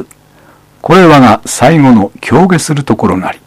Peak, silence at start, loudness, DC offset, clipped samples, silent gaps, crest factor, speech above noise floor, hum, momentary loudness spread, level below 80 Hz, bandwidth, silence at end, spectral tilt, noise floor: 0 dBFS; 0 s; -7 LUFS; under 0.1%; 4%; none; 8 dB; 35 dB; none; 8 LU; -38 dBFS; 15.5 kHz; 0.15 s; -6 dB/octave; -42 dBFS